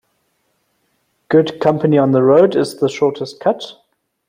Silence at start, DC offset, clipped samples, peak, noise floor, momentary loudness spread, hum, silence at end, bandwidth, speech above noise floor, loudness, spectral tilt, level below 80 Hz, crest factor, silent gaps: 1.3 s; under 0.1%; under 0.1%; -2 dBFS; -65 dBFS; 8 LU; none; 0.55 s; 15.5 kHz; 51 dB; -15 LUFS; -7 dB/octave; -60 dBFS; 14 dB; none